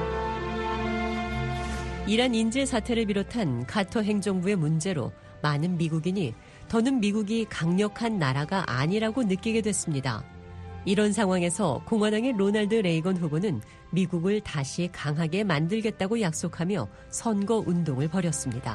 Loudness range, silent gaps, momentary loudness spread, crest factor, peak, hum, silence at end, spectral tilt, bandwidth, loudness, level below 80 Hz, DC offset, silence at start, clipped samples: 2 LU; none; 7 LU; 18 dB; -10 dBFS; none; 0 s; -5.5 dB/octave; 11.5 kHz; -27 LUFS; -46 dBFS; under 0.1%; 0 s; under 0.1%